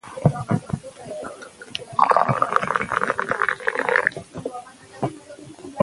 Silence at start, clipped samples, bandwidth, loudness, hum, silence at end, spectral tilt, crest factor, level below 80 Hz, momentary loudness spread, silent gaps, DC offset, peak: 0.05 s; under 0.1%; 11.5 kHz; -23 LUFS; none; 0 s; -6 dB/octave; 24 dB; -52 dBFS; 20 LU; none; under 0.1%; 0 dBFS